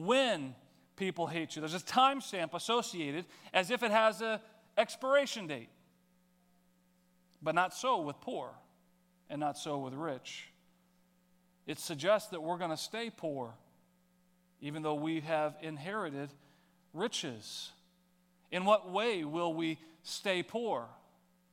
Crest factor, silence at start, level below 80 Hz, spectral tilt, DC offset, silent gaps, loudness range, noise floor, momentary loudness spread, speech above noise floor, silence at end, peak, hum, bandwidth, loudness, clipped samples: 24 dB; 0 s; -86 dBFS; -4 dB/octave; under 0.1%; none; 7 LU; -71 dBFS; 15 LU; 36 dB; 0.55 s; -12 dBFS; none; 17 kHz; -35 LUFS; under 0.1%